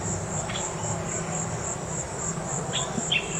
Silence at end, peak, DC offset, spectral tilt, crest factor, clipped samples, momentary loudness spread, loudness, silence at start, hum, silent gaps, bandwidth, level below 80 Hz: 0 s; -14 dBFS; under 0.1%; -3 dB/octave; 16 dB; under 0.1%; 4 LU; -29 LUFS; 0 s; none; none; 16 kHz; -48 dBFS